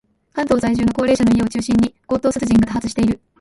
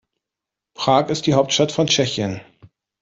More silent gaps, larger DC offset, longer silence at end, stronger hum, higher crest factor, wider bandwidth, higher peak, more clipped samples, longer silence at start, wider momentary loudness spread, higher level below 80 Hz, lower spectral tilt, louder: neither; neither; about the same, 0.25 s vs 0.35 s; neither; about the same, 14 dB vs 18 dB; first, 11.5 kHz vs 8 kHz; about the same, -4 dBFS vs -2 dBFS; neither; second, 0.35 s vs 0.8 s; second, 5 LU vs 8 LU; first, -38 dBFS vs -56 dBFS; first, -6 dB/octave vs -4 dB/octave; about the same, -18 LUFS vs -18 LUFS